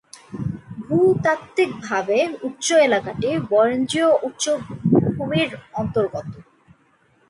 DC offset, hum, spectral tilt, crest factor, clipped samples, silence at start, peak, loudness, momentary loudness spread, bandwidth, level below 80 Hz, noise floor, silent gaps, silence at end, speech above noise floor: under 0.1%; none; -5 dB/octave; 18 dB; under 0.1%; 0.3 s; -4 dBFS; -20 LUFS; 12 LU; 11.5 kHz; -54 dBFS; -59 dBFS; none; 0.85 s; 39 dB